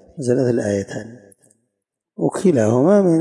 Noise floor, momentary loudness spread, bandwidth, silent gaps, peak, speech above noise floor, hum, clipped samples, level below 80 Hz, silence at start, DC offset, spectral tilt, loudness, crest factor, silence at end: -78 dBFS; 16 LU; 11.5 kHz; none; -4 dBFS; 62 dB; none; under 0.1%; -62 dBFS; 0.15 s; under 0.1%; -7.5 dB/octave; -17 LUFS; 14 dB; 0 s